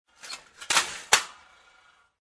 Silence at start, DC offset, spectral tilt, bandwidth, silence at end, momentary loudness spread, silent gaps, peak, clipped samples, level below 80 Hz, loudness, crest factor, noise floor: 0.25 s; under 0.1%; 1.5 dB/octave; 11 kHz; 0.9 s; 17 LU; none; -4 dBFS; under 0.1%; -66 dBFS; -24 LUFS; 26 dB; -61 dBFS